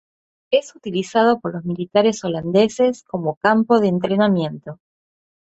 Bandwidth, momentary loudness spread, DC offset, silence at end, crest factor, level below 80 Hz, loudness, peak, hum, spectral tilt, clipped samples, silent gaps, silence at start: 8.2 kHz; 10 LU; under 0.1%; 0.75 s; 18 dB; -60 dBFS; -19 LUFS; -2 dBFS; none; -6 dB/octave; under 0.1%; 3.37-3.41 s; 0.5 s